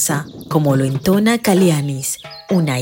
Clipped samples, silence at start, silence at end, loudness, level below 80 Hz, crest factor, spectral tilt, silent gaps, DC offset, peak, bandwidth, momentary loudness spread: under 0.1%; 0 s; 0 s; -16 LUFS; -50 dBFS; 14 dB; -5.5 dB/octave; none; under 0.1%; -2 dBFS; 16.5 kHz; 9 LU